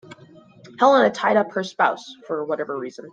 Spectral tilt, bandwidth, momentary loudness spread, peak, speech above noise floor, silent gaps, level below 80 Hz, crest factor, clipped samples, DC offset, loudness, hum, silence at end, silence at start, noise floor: -5 dB/octave; 7.8 kHz; 14 LU; -4 dBFS; 28 dB; none; -70 dBFS; 18 dB; under 0.1%; under 0.1%; -21 LUFS; none; 0.05 s; 0.1 s; -48 dBFS